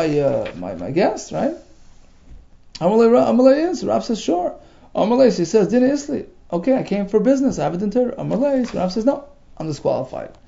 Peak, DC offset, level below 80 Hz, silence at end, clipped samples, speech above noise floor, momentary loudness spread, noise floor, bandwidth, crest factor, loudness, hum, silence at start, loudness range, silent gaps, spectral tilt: -2 dBFS; under 0.1%; -48 dBFS; 0.15 s; under 0.1%; 27 dB; 14 LU; -45 dBFS; 7.8 kHz; 18 dB; -19 LUFS; none; 0 s; 3 LU; none; -6.5 dB/octave